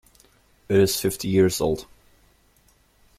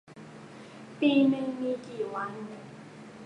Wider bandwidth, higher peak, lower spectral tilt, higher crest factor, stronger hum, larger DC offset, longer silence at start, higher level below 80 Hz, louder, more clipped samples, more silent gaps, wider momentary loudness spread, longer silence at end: first, 16 kHz vs 9.8 kHz; first, -6 dBFS vs -12 dBFS; second, -5 dB/octave vs -6.5 dB/octave; about the same, 18 dB vs 18 dB; neither; neither; first, 0.7 s vs 0.1 s; first, -50 dBFS vs -76 dBFS; first, -22 LUFS vs -29 LUFS; neither; neither; second, 6 LU vs 23 LU; first, 1.35 s vs 0 s